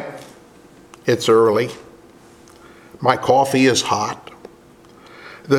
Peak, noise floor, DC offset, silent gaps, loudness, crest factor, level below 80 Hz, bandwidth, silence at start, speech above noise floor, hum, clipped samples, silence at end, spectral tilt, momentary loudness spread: 0 dBFS; -46 dBFS; under 0.1%; none; -17 LUFS; 20 dB; -60 dBFS; 16 kHz; 0 s; 30 dB; none; under 0.1%; 0 s; -4.5 dB/octave; 24 LU